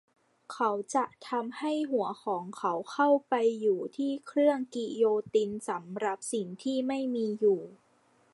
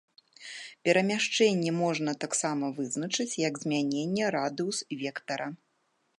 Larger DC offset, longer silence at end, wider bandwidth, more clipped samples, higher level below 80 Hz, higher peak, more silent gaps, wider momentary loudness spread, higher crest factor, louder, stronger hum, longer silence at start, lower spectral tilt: neither; about the same, 0.6 s vs 0.65 s; about the same, 11.5 kHz vs 11.5 kHz; neither; about the same, -80 dBFS vs -78 dBFS; second, -14 dBFS vs -10 dBFS; neither; about the same, 8 LU vs 10 LU; about the same, 16 dB vs 20 dB; about the same, -30 LUFS vs -29 LUFS; neither; about the same, 0.5 s vs 0.4 s; about the same, -5 dB/octave vs -4 dB/octave